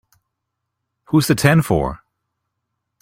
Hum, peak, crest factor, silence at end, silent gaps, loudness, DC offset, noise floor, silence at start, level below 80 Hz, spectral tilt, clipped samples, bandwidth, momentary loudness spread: none; -2 dBFS; 18 dB; 1.05 s; none; -17 LUFS; under 0.1%; -78 dBFS; 1.1 s; -42 dBFS; -6 dB/octave; under 0.1%; 16.5 kHz; 6 LU